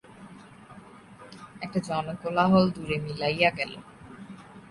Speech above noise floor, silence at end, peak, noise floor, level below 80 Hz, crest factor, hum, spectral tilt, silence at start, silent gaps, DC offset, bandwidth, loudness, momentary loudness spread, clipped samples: 23 dB; 0.1 s; -8 dBFS; -49 dBFS; -58 dBFS; 22 dB; none; -6.5 dB/octave; 0.1 s; none; under 0.1%; 11.5 kHz; -26 LUFS; 26 LU; under 0.1%